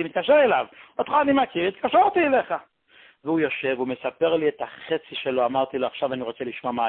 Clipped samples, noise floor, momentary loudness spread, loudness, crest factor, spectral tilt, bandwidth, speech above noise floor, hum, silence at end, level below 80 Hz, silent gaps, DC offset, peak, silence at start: under 0.1%; -55 dBFS; 12 LU; -23 LUFS; 16 dB; -9.5 dB/octave; 4.3 kHz; 32 dB; none; 0 s; -64 dBFS; none; under 0.1%; -8 dBFS; 0 s